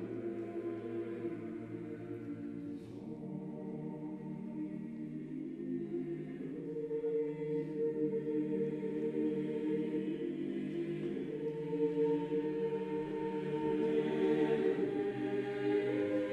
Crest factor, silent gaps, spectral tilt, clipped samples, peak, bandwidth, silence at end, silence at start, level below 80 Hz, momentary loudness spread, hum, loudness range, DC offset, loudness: 16 dB; none; -8.5 dB/octave; under 0.1%; -20 dBFS; 9 kHz; 0 s; 0 s; -72 dBFS; 10 LU; none; 9 LU; under 0.1%; -38 LUFS